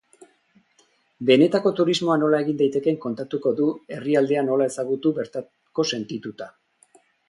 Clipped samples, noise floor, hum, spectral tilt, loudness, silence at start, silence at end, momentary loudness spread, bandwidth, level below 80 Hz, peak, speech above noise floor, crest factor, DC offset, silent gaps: under 0.1%; -63 dBFS; none; -5.5 dB/octave; -22 LUFS; 1.2 s; 0.8 s; 14 LU; 11.5 kHz; -70 dBFS; -4 dBFS; 41 dB; 20 dB; under 0.1%; none